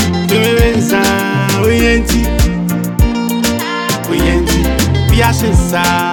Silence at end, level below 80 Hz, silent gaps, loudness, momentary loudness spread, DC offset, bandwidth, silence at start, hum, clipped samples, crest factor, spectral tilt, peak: 0 s; -18 dBFS; none; -12 LUFS; 4 LU; under 0.1%; over 20 kHz; 0 s; none; under 0.1%; 10 dB; -5 dB/octave; 0 dBFS